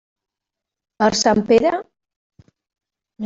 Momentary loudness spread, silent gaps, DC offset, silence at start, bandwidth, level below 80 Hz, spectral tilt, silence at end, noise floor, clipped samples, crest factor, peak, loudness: 6 LU; 2.16-2.30 s; under 0.1%; 1 s; 8 kHz; -54 dBFS; -4 dB/octave; 0 s; -85 dBFS; under 0.1%; 18 dB; -2 dBFS; -17 LUFS